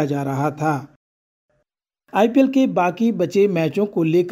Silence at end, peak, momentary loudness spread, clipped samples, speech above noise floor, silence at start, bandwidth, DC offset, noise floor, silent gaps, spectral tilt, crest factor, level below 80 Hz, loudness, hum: 0 s; -4 dBFS; 7 LU; under 0.1%; 56 dB; 0 s; 15 kHz; under 0.1%; -74 dBFS; 0.96-1.49 s; -7.5 dB/octave; 16 dB; -66 dBFS; -19 LUFS; none